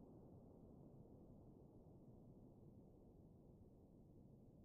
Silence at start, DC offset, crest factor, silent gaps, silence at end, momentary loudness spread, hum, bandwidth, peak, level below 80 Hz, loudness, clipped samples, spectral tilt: 0 s; under 0.1%; 12 dB; none; 0 s; 3 LU; none; 1.5 kHz; -52 dBFS; -74 dBFS; -66 LUFS; under 0.1%; -7.5 dB/octave